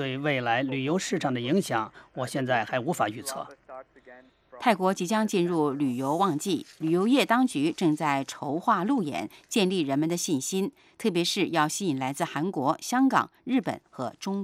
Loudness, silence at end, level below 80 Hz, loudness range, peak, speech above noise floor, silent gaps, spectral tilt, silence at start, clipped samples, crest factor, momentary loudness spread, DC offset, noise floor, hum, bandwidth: -27 LUFS; 0 s; -72 dBFS; 4 LU; -6 dBFS; 26 dB; none; -4.5 dB/octave; 0 s; under 0.1%; 20 dB; 11 LU; under 0.1%; -53 dBFS; none; 16 kHz